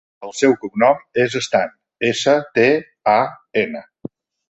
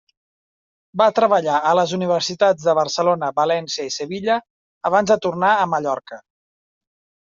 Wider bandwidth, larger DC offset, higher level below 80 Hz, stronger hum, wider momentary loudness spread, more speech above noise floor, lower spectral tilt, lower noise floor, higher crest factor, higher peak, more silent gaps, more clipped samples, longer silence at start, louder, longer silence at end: first, 8.4 kHz vs 7.6 kHz; neither; about the same, -62 dBFS vs -66 dBFS; neither; first, 16 LU vs 9 LU; second, 20 dB vs over 72 dB; about the same, -4.5 dB/octave vs -4 dB/octave; second, -37 dBFS vs under -90 dBFS; about the same, 18 dB vs 18 dB; about the same, 0 dBFS vs -2 dBFS; second, none vs 4.50-4.81 s; neither; second, 0.2 s vs 0.95 s; about the same, -18 LUFS vs -19 LUFS; second, 0.45 s vs 1.1 s